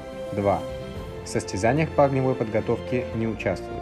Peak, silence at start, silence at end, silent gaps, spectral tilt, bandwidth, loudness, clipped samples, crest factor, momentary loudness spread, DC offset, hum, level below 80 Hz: -6 dBFS; 0 s; 0 s; none; -6.5 dB/octave; 14 kHz; -25 LUFS; under 0.1%; 18 dB; 12 LU; under 0.1%; none; -46 dBFS